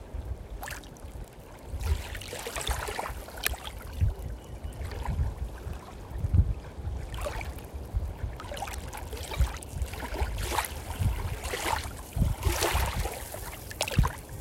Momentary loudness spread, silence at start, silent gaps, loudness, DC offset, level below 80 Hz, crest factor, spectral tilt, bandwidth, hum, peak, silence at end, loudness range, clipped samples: 13 LU; 0 s; none; -33 LUFS; under 0.1%; -36 dBFS; 30 dB; -4.5 dB/octave; 16.5 kHz; none; -2 dBFS; 0 s; 5 LU; under 0.1%